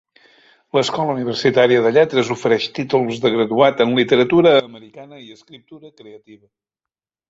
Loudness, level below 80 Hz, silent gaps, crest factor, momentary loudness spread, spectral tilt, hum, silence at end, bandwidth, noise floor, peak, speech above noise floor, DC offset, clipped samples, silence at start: -16 LUFS; -60 dBFS; none; 16 dB; 7 LU; -5.5 dB/octave; none; 0.95 s; 8 kHz; -87 dBFS; -2 dBFS; 70 dB; under 0.1%; under 0.1%; 0.75 s